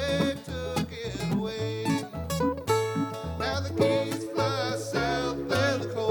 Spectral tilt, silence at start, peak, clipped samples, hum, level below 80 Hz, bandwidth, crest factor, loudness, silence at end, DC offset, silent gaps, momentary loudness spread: -5.5 dB/octave; 0 s; -10 dBFS; under 0.1%; none; -48 dBFS; 19 kHz; 18 dB; -29 LUFS; 0 s; under 0.1%; none; 6 LU